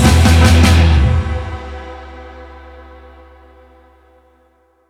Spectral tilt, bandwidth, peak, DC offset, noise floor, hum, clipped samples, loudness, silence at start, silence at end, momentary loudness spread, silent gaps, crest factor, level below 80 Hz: -5.5 dB/octave; 14.5 kHz; 0 dBFS; under 0.1%; -55 dBFS; none; under 0.1%; -11 LUFS; 0 s; 2.45 s; 25 LU; none; 14 dB; -20 dBFS